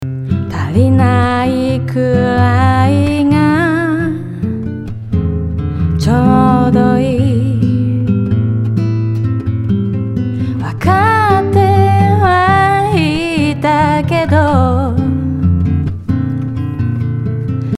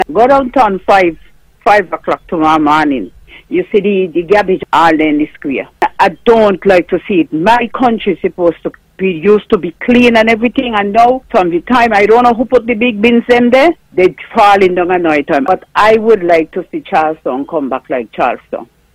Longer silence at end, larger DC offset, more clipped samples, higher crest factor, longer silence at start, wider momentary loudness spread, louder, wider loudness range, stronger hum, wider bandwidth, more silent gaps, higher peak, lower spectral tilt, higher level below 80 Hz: second, 0 s vs 0.3 s; neither; second, under 0.1% vs 0.3%; about the same, 12 dB vs 10 dB; about the same, 0 s vs 0 s; about the same, 8 LU vs 9 LU; second, -13 LUFS vs -10 LUFS; about the same, 4 LU vs 3 LU; neither; second, 12 kHz vs 15 kHz; neither; about the same, 0 dBFS vs 0 dBFS; first, -8 dB/octave vs -6 dB/octave; first, -34 dBFS vs -42 dBFS